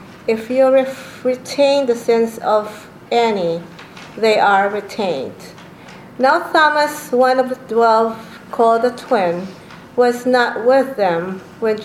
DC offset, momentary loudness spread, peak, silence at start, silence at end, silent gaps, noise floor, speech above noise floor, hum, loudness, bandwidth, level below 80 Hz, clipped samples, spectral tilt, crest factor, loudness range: under 0.1%; 15 LU; 0 dBFS; 0 s; 0 s; none; -38 dBFS; 22 dB; none; -16 LUFS; 15.5 kHz; -60 dBFS; under 0.1%; -4.5 dB/octave; 16 dB; 3 LU